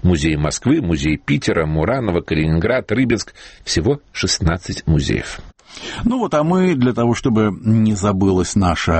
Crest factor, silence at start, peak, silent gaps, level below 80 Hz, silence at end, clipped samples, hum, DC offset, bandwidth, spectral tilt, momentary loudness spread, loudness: 14 dB; 0.05 s; -4 dBFS; none; -32 dBFS; 0 s; under 0.1%; none; under 0.1%; 8.8 kHz; -5.5 dB/octave; 6 LU; -17 LUFS